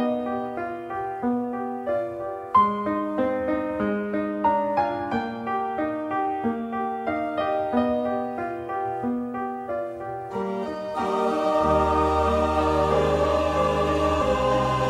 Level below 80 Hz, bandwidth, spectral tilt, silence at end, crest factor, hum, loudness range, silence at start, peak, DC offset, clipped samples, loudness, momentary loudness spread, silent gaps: -42 dBFS; 13.5 kHz; -6.5 dB/octave; 0 s; 16 dB; none; 6 LU; 0 s; -8 dBFS; under 0.1%; under 0.1%; -25 LUFS; 9 LU; none